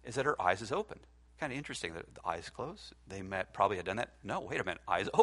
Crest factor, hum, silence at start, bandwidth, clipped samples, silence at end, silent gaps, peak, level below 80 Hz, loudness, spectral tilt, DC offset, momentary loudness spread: 24 dB; none; 0.05 s; 11.5 kHz; under 0.1%; 0 s; none; -12 dBFS; -62 dBFS; -37 LUFS; -4.5 dB/octave; under 0.1%; 13 LU